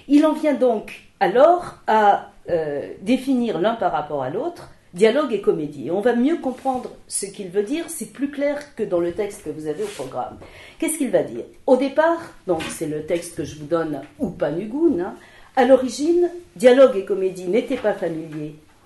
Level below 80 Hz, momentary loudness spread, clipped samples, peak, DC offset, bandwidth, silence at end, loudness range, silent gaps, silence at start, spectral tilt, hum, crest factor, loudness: -54 dBFS; 13 LU; under 0.1%; -2 dBFS; under 0.1%; 12 kHz; 0.3 s; 7 LU; none; 0.05 s; -5 dB/octave; none; 18 dB; -21 LUFS